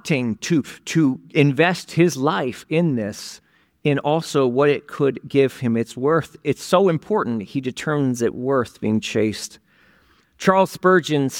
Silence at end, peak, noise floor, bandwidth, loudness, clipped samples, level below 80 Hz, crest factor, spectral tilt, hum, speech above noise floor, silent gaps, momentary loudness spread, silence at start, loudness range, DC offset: 0 s; -2 dBFS; -57 dBFS; 17.5 kHz; -20 LUFS; under 0.1%; -60 dBFS; 18 dB; -6 dB/octave; none; 37 dB; none; 8 LU; 0.05 s; 2 LU; under 0.1%